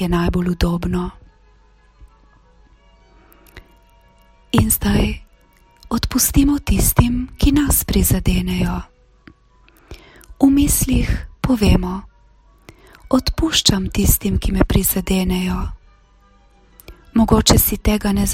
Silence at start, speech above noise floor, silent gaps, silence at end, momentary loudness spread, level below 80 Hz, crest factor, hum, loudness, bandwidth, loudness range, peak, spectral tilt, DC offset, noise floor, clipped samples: 0 s; 36 dB; none; 0 s; 9 LU; -26 dBFS; 18 dB; none; -17 LUFS; 16.5 kHz; 6 LU; 0 dBFS; -4.5 dB/octave; under 0.1%; -52 dBFS; under 0.1%